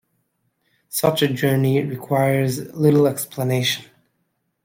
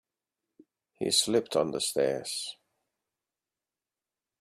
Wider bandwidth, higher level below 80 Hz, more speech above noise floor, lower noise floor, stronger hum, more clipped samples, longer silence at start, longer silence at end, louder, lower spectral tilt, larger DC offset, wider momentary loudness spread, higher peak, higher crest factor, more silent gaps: about the same, 16.5 kHz vs 15.5 kHz; first, -60 dBFS vs -72 dBFS; second, 52 dB vs over 61 dB; second, -71 dBFS vs under -90 dBFS; neither; neither; about the same, 0.9 s vs 1 s; second, 0.8 s vs 1.9 s; first, -20 LUFS vs -28 LUFS; first, -5.5 dB/octave vs -2.5 dB/octave; neither; second, 7 LU vs 11 LU; first, -4 dBFS vs -12 dBFS; about the same, 18 dB vs 22 dB; neither